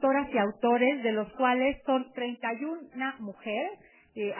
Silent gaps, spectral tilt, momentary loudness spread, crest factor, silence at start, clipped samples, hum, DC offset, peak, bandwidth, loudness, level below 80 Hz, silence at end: none; -8.5 dB/octave; 11 LU; 16 dB; 0 s; under 0.1%; none; under 0.1%; -12 dBFS; 3.2 kHz; -29 LUFS; -62 dBFS; 0 s